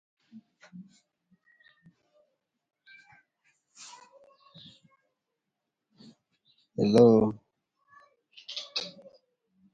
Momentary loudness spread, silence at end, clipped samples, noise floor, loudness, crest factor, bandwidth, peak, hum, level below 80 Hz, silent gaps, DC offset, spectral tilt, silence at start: 31 LU; 0.85 s; under 0.1%; -85 dBFS; -25 LUFS; 26 dB; 11 kHz; -8 dBFS; none; -68 dBFS; none; under 0.1%; -7 dB/octave; 0.75 s